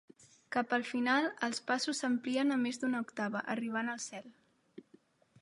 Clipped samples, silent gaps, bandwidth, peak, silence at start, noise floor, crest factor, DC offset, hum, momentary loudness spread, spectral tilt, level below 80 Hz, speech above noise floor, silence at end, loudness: under 0.1%; none; 11.5 kHz; -18 dBFS; 0.2 s; -66 dBFS; 18 dB; under 0.1%; none; 7 LU; -3 dB/octave; -86 dBFS; 32 dB; 0.6 s; -34 LUFS